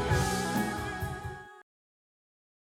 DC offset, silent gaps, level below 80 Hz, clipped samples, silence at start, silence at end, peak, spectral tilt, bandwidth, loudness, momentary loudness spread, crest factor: under 0.1%; none; -46 dBFS; under 0.1%; 0 s; 1.15 s; -16 dBFS; -5 dB/octave; 19 kHz; -32 LUFS; 17 LU; 18 dB